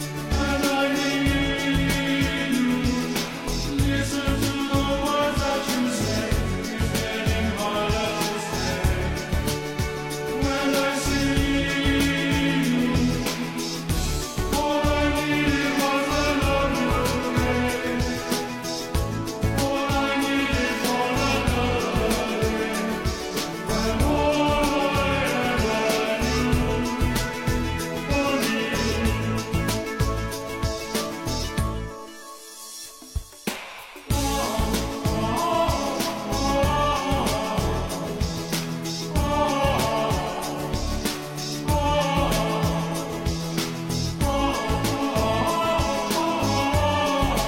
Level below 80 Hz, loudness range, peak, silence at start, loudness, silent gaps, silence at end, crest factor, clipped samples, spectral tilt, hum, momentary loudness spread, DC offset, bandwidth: -32 dBFS; 3 LU; -8 dBFS; 0 s; -24 LUFS; none; 0 s; 16 dB; under 0.1%; -4.5 dB/octave; none; 6 LU; under 0.1%; 16.5 kHz